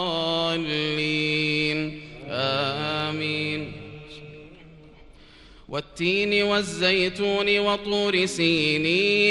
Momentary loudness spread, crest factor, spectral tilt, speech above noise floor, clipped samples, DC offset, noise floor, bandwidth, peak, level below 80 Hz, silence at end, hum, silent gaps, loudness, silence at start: 14 LU; 18 dB; -4.5 dB/octave; 26 dB; under 0.1%; under 0.1%; -49 dBFS; 12 kHz; -6 dBFS; -54 dBFS; 0 s; none; none; -23 LUFS; 0 s